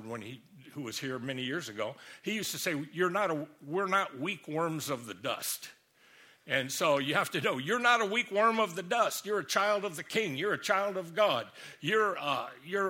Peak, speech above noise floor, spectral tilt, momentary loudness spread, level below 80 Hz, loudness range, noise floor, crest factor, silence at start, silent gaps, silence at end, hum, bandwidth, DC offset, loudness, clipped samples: -10 dBFS; 29 dB; -3.5 dB/octave; 11 LU; -78 dBFS; 6 LU; -61 dBFS; 22 dB; 0 s; none; 0 s; none; 17 kHz; under 0.1%; -31 LUFS; under 0.1%